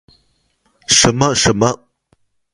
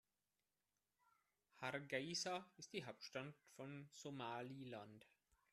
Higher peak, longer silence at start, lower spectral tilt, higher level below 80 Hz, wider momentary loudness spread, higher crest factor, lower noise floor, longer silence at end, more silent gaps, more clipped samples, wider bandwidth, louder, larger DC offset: first, 0 dBFS vs -30 dBFS; second, 0.9 s vs 1.55 s; about the same, -3 dB/octave vs -3.5 dB/octave; first, -40 dBFS vs -90 dBFS; first, 17 LU vs 12 LU; second, 18 dB vs 24 dB; second, -61 dBFS vs under -90 dBFS; first, 0.8 s vs 0.45 s; neither; neither; first, 15.5 kHz vs 13.5 kHz; first, -13 LUFS vs -51 LUFS; neither